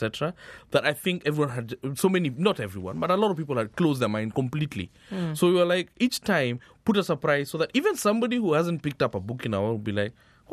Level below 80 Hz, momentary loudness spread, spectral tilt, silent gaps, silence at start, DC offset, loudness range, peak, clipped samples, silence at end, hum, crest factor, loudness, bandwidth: -60 dBFS; 8 LU; -5.5 dB/octave; none; 0 s; under 0.1%; 2 LU; -6 dBFS; under 0.1%; 0 s; none; 20 dB; -26 LUFS; 14 kHz